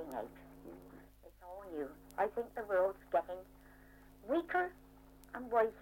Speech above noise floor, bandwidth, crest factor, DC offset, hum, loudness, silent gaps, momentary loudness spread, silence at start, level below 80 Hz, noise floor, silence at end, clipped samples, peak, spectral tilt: 22 dB; 16.5 kHz; 20 dB; under 0.1%; none; -38 LUFS; none; 21 LU; 0 s; -64 dBFS; -60 dBFS; 0 s; under 0.1%; -20 dBFS; -6 dB/octave